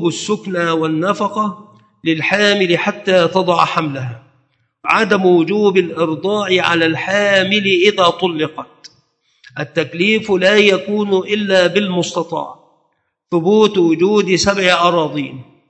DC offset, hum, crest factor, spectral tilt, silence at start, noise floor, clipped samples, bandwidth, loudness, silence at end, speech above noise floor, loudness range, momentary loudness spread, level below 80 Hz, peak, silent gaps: under 0.1%; none; 16 dB; -4.5 dB/octave; 0 s; -66 dBFS; under 0.1%; 8.6 kHz; -14 LUFS; 0.25 s; 51 dB; 2 LU; 11 LU; -54 dBFS; 0 dBFS; none